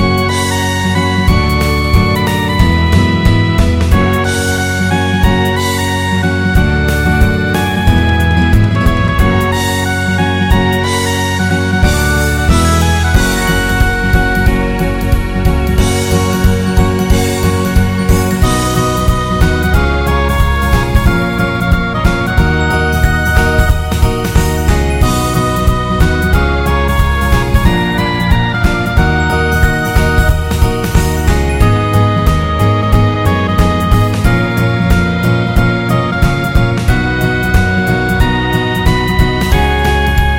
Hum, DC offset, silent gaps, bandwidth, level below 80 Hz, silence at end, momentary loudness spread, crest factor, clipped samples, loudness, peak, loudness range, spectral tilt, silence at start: none; under 0.1%; none; 17 kHz; -16 dBFS; 0 s; 2 LU; 10 dB; 0.3%; -12 LUFS; 0 dBFS; 1 LU; -5.5 dB/octave; 0 s